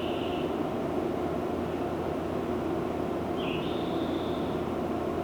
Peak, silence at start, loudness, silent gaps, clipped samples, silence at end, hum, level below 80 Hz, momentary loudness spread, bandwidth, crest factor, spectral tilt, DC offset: -18 dBFS; 0 s; -31 LUFS; none; under 0.1%; 0 s; none; -52 dBFS; 1 LU; over 20 kHz; 12 dB; -7 dB/octave; under 0.1%